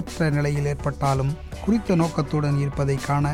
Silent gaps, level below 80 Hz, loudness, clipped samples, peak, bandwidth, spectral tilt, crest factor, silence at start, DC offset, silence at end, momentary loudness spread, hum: none; -38 dBFS; -23 LUFS; under 0.1%; -10 dBFS; 13 kHz; -7 dB/octave; 14 dB; 0 s; under 0.1%; 0 s; 3 LU; none